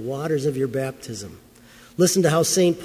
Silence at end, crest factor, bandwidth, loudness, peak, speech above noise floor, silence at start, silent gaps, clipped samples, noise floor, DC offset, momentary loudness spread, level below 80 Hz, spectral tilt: 0 s; 18 dB; 16 kHz; -21 LUFS; -6 dBFS; 27 dB; 0 s; none; under 0.1%; -49 dBFS; under 0.1%; 17 LU; -56 dBFS; -4.5 dB/octave